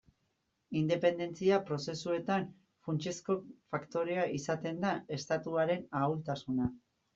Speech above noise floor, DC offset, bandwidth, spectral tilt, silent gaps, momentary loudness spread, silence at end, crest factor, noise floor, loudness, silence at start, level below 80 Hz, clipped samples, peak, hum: 46 dB; under 0.1%; 8 kHz; -6 dB/octave; none; 8 LU; 0.35 s; 20 dB; -80 dBFS; -35 LUFS; 0.7 s; -68 dBFS; under 0.1%; -16 dBFS; none